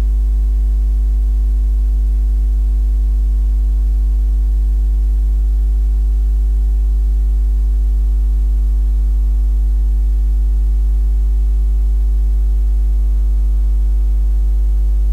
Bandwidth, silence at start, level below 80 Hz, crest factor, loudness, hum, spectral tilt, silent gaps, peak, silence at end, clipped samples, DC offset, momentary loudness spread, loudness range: 1.1 kHz; 0 s; -12 dBFS; 4 dB; -17 LUFS; none; -8.5 dB/octave; none; -8 dBFS; 0 s; under 0.1%; under 0.1%; 0 LU; 0 LU